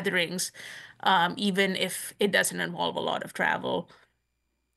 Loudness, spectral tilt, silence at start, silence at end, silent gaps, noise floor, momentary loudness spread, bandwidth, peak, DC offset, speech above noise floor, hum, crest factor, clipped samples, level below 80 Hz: -27 LUFS; -3 dB/octave; 0 s; 0.9 s; none; -77 dBFS; 9 LU; 12.5 kHz; -10 dBFS; under 0.1%; 49 dB; none; 20 dB; under 0.1%; -72 dBFS